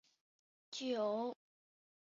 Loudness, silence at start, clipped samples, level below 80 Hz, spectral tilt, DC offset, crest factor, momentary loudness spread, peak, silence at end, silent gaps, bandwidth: -41 LUFS; 0.7 s; under 0.1%; under -90 dBFS; -3 dB/octave; under 0.1%; 16 dB; 13 LU; -28 dBFS; 0.8 s; none; 7.4 kHz